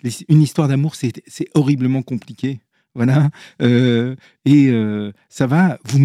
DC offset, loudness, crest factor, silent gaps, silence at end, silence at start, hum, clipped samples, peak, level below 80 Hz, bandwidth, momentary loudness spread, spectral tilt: under 0.1%; -17 LUFS; 16 dB; none; 0 s; 0.05 s; none; under 0.1%; 0 dBFS; -62 dBFS; 13 kHz; 12 LU; -7.5 dB/octave